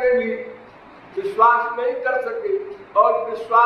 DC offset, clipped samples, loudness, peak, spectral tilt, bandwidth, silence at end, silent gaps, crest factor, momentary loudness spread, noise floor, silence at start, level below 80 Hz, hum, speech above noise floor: under 0.1%; under 0.1%; -20 LUFS; -4 dBFS; -5.5 dB/octave; 6.2 kHz; 0 s; none; 16 dB; 13 LU; -44 dBFS; 0 s; -60 dBFS; none; 25 dB